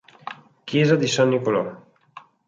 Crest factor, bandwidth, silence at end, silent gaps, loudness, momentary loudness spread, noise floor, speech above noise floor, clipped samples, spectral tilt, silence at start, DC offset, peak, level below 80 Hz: 18 dB; 9.4 kHz; 0.3 s; none; -20 LUFS; 19 LU; -48 dBFS; 28 dB; under 0.1%; -5.5 dB/octave; 0.25 s; under 0.1%; -4 dBFS; -66 dBFS